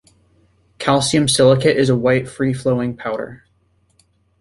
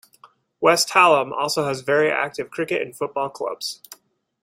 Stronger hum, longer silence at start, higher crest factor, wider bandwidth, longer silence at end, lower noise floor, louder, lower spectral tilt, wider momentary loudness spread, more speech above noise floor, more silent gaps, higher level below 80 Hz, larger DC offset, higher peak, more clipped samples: neither; first, 0.8 s vs 0.6 s; about the same, 18 dB vs 20 dB; second, 11.5 kHz vs 16 kHz; first, 1.05 s vs 0.5 s; first, -60 dBFS vs -54 dBFS; first, -17 LUFS vs -20 LUFS; first, -5 dB/octave vs -3 dB/octave; about the same, 12 LU vs 13 LU; first, 44 dB vs 33 dB; neither; first, -50 dBFS vs -68 dBFS; neither; about the same, 0 dBFS vs -2 dBFS; neither